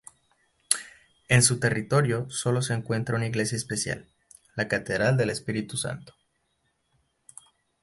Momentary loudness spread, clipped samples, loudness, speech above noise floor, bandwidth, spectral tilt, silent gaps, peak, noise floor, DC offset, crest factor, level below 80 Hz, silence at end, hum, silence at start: 11 LU; under 0.1%; -26 LUFS; 47 dB; 12 kHz; -4 dB/octave; none; -2 dBFS; -73 dBFS; under 0.1%; 26 dB; -56 dBFS; 1.7 s; none; 0.7 s